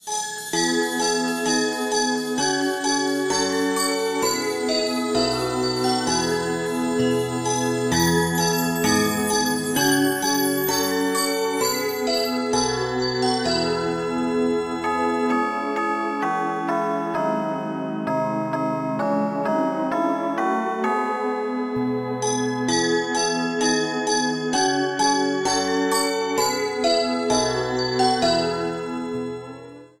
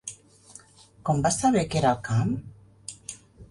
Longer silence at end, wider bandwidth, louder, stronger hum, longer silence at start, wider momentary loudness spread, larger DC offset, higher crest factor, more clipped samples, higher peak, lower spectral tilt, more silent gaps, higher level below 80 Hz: about the same, 0.15 s vs 0.05 s; first, 16 kHz vs 11.5 kHz; first, -22 LUFS vs -25 LUFS; neither; about the same, 0.05 s vs 0.05 s; second, 5 LU vs 19 LU; neither; about the same, 16 dB vs 18 dB; neither; first, -6 dBFS vs -10 dBFS; second, -3.5 dB/octave vs -5.5 dB/octave; neither; about the same, -54 dBFS vs -52 dBFS